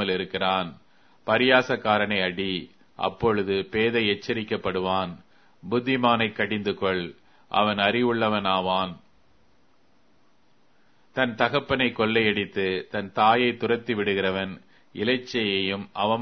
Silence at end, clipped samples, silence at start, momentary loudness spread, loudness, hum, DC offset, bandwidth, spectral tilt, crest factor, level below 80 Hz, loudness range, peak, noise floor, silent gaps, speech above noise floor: 0 s; under 0.1%; 0 s; 9 LU; -24 LUFS; none; 0.1%; 6.6 kHz; -6 dB/octave; 24 dB; -58 dBFS; 4 LU; -2 dBFS; -65 dBFS; none; 40 dB